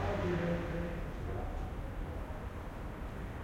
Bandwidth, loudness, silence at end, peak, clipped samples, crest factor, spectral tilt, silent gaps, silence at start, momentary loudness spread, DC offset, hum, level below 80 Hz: 16.5 kHz; -40 LUFS; 0 s; -22 dBFS; under 0.1%; 16 dB; -7.5 dB/octave; none; 0 s; 10 LU; under 0.1%; none; -44 dBFS